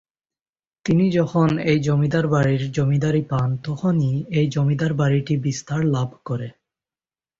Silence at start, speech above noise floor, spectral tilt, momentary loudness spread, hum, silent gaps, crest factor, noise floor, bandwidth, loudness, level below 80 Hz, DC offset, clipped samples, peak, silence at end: 0.85 s; over 70 dB; -7.5 dB/octave; 7 LU; none; none; 14 dB; under -90 dBFS; 7.6 kHz; -21 LUFS; -50 dBFS; under 0.1%; under 0.1%; -6 dBFS; 0.9 s